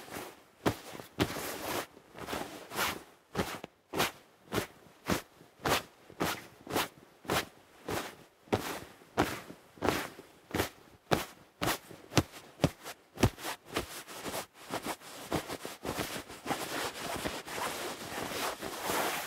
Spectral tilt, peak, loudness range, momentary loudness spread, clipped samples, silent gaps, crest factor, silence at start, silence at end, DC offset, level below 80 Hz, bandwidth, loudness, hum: -4 dB/octave; -2 dBFS; 3 LU; 13 LU; under 0.1%; none; 34 dB; 0 s; 0 s; under 0.1%; -56 dBFS; 16 kHz; -36 LUFS; none